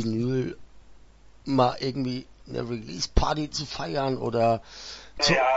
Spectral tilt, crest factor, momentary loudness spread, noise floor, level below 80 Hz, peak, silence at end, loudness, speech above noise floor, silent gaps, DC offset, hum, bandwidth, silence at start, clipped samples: -5 dB/octave; 22 dB; 14 LU; -52 dBFS; -40 dBFS; -4 dBFS; 0 s; -27 LUFS; 26 dB; none; under 0.1%; none; 8 kHz; 0 s; under 0.1%